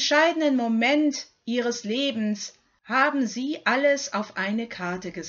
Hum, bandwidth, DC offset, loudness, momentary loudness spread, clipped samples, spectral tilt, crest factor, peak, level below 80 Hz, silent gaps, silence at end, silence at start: none; 7.6 kHz; under 0.1%; -24 LUFS; 10 LU; under 0.1%; -3.5 dB/octave; 18 dB; -8 dBFS; -70 dBFS; none; 0 s; 0 s